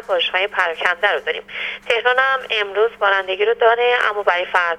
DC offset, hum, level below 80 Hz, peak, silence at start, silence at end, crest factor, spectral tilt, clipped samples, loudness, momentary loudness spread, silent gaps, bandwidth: under 0.1%; none; -60 dBFS; 0 dBFS; 0 s; 0 s; 18 dB; -1.5 dB/octave; under 0.1%; -17 LUFS; 6 LU; none; 11.5 kHz